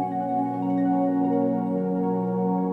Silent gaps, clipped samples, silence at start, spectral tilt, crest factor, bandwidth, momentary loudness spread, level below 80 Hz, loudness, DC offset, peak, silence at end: none; under 0.1%; 0 s; -11.5 dB/octave; 10 dB; 3.6 kHz; 3 LU; -66 dBFS; -25 LUFS; under 0.1%; -14 dBFS; 0 s